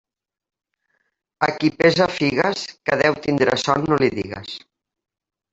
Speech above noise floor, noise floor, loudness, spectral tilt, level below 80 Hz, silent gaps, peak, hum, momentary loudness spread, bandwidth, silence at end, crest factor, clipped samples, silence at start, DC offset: 51 dB; -71 dBFS; -19 LUFS; -5 dB/octave; -54 dBFS; none; -2 dBFS; none; 13 LU; 8 kHz; 0.95 s; 20 dB; under 0.1%; 1.4 s; under 0.1%